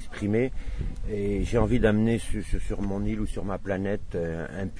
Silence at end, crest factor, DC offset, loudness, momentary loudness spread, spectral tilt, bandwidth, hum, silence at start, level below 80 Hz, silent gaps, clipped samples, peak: 0 s; 16 dB; under 0.1%; -28 LUFS; 10 LU; -7.5 dB/octave; 10.5 kHz; none; 0 s; -34 dBFS; none; under 0.1%; -10 dBFS